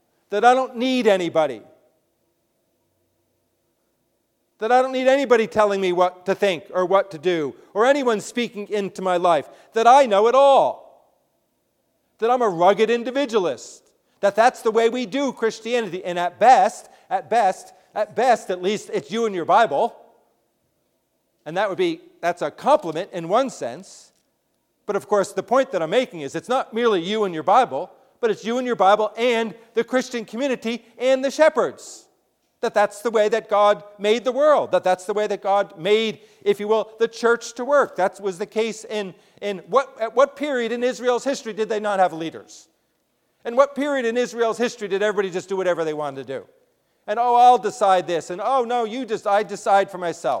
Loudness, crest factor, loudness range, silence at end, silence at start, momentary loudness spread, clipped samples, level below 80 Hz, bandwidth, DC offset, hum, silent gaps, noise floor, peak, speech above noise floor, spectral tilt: -21 LUFS; 20 dB; 5 LU; 0 s; 0.3 s; 11 LU; under 0.1%; -72 dBFS; 15 kHz; under 0.1%; none; none; -70 dBFS; -2 dBFS; 50 dB; -4 dB/octave